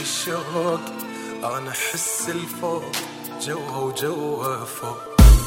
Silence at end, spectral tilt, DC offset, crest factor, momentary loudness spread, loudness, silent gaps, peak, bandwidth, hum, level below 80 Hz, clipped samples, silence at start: 0 s; -4.5 dB/octave; under 0.1%; 20 dB; 8 LU; -24 LUFS; none; 0 dBFS; 16.5 kHz; none; -22 dBFS; under 0.1%; 0 s